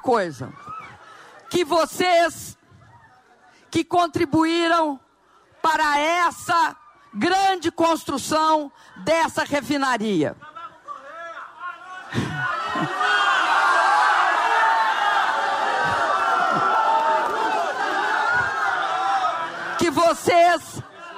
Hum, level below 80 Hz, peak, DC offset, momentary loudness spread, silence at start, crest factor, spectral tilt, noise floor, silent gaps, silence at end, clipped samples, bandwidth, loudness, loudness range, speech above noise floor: none; -60 dBFS; -6 dBFS; under 0.1%; 18 LU; 0.05 s; 14 dB; -3.5 dB/octave; -57 dBFS; none; 0 s; under 0.1%; 16 kHz; -20 LUFS; 6 LU; 36 dB